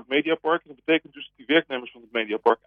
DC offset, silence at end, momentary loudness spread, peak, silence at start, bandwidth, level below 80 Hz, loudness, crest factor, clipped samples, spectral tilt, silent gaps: under 0.1%; 0.1 s; 11 LU; -6 dBFS; 0.1 s; 4.9 kHz; -74 dBFS; -25 LUFS; 20 dB; under 0.1%; -6.5 dB/octave; none